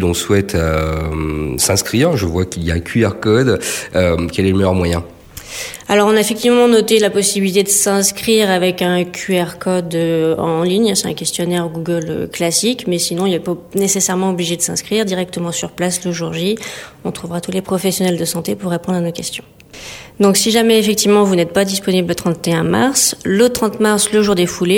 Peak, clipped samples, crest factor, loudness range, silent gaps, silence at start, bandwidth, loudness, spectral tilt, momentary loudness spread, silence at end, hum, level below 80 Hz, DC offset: 0 dBFS; under 0.1%; 14 dB; 6 LU; none; 0 s; 17.5 kHz; -15 LUFS; -4 dB/octave; 9 LU; 0 s; none; -38 dBFS; under 0.1%